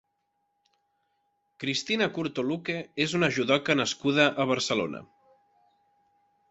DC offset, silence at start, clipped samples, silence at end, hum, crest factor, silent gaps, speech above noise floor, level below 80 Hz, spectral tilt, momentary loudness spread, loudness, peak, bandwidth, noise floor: under 0.1%; 1.6 s; under 0.1%; 1.45 s; none; 24 dB; none; 50 dB; -68 dBFS; -4 dB/octave; 9 LU; -27 LUFS; -6 dBFS; 8.4 kHz; -77 dBFS